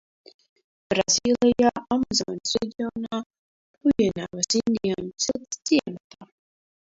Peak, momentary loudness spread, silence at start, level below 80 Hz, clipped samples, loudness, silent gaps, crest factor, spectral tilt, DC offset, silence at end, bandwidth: -6 dBFS; 11 LU; 0.9 s; -56 dBFS; under 0.1%; -24 LUFS; 3.26-3.30 s, 3.39-3.74 s, 6.00-6.10 s; 18 dB; -3.5 dB/octave; under 0.1%; 0.6 s; 7.8 kHz